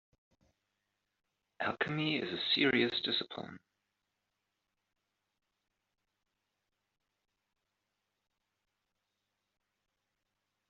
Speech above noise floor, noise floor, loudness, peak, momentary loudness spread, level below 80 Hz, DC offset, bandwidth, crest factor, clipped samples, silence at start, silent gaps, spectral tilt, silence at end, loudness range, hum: 52 dB; -86 dBFS; -32 LUFS; -16 dBFS; 15 LU; -78 dBFS; under 0.1%; 7.4 kHz; 26 dB; under 0.1%; 1.6 s; none; -2 dB/octave; 7.1 s; 9 LU; none